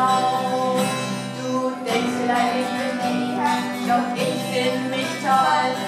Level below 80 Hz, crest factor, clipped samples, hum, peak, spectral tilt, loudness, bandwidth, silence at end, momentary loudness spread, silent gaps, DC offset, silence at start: -72 dBFS; 16 dB; under 0.1%; none; -6 dBFS; -4.5 dB/octave; -22 LUFS; 16 kHz; 0 s; 5 LU; none; under 0.1%; 0 s